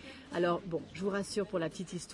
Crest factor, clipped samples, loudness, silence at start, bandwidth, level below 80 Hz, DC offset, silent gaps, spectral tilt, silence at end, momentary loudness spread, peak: 16 dB; under 0.1%; -36 LUFS; 0 s; 11.5 kHz; -64 dBFS; under 0.1%; none; -5.5 dB/octave; 0 s; 8 LU; -20 dBFS